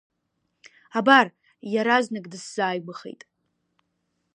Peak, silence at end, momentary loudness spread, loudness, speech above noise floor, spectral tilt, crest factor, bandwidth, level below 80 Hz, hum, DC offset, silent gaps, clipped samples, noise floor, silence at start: -2 dBFS; 1.25 s; 22 LU; -22 LUFS; 53 dB; -4 dB/octave; 24 dB; 10.5 kHz; -80 dBFS; none; under 0.1%; none; under 0.1%; -76 dBFS; 0.95 s